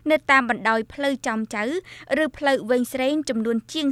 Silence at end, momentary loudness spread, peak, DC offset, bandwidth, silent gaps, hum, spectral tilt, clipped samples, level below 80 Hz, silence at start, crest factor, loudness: 0 s; 8 LU; -4 dBFS; under 0.1%; 15 kHz; none; none; -4 dB/octave; under 0.1%; -58 dBFS; 0.05 s; 20 dB; -22 LUFS